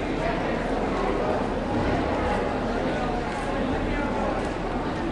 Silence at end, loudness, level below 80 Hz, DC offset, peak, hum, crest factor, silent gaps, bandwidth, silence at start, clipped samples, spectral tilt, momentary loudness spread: 0 s; -26 LUFS; -36 dBFS; under 0.1%; -12 dBFS; none; 14 dB; none; 11 kHz; 0 s; under 0.1%; -6.5 dB/octave; 3 LU